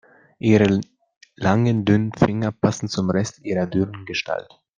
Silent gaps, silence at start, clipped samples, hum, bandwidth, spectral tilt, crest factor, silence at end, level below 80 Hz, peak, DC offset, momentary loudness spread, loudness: 1.17-1.21 s; 0.45 s; under 0.1%; none; 9.4 kHz; -6.5 dB/octave; 18 dB; 0.35 s; -52 dBFS; -2 dBFS; under 0.1%; 8 LU; -21 LUFS